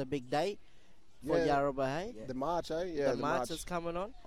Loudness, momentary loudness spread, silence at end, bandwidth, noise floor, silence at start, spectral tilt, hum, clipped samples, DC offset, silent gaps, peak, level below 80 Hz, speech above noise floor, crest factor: -35 LUFS; 9 LU; 0 s; 15.5 kHz; -63 dBFS; 0 s; -5.5 dB/octave; none; under 0.1%; 0.3%; none; -20 dBFS; -54 dBFS; 28 dB; 16 dB